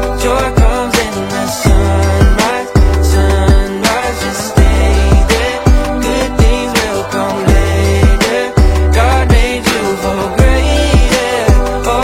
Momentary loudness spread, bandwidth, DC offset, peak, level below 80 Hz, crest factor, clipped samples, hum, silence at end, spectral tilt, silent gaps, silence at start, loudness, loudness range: 4 LU; 16 kHz; under 0.1%; 0 dBFS; -12 dBFS; 10 dB; under 0.1%; none; 0 s; -5.5 dB/octave; none; 0 s; -12 LUFS; 1 LU